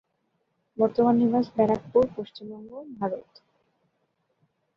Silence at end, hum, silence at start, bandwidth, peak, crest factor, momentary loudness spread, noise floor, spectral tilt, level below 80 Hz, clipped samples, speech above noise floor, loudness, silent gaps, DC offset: 1.55 s; none; 0.8 s; 5.8 kHz; -8 dBFS; 18 dB; 20 LU; -74 dBFS; -9 dB/octave; -62 dBFS; under 0.1%; 50 dB; -24 LUFS; none; under 0.1%